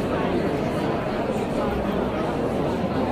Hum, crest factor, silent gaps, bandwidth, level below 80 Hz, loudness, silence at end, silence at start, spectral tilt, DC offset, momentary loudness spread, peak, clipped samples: none; 12 dB; none; 15.5 kHz; -40 dBFS; -25 LUFS; 0 s; 0 s; -7 dB/octave; under 0.1%; 1 LU; -12 dBFS; under 0.1%